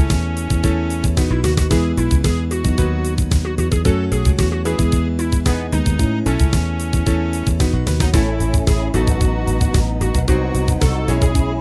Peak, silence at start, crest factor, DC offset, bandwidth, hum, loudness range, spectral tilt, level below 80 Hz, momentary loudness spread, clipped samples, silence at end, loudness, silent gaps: -2 dBFS; 0 s; 14 dB; 0.2%; 11 kHz; none; 1 LU; -6 dB/octave; -20 dBFS; 2 LU; under 0.1%; 0 s; -18 LUFS; none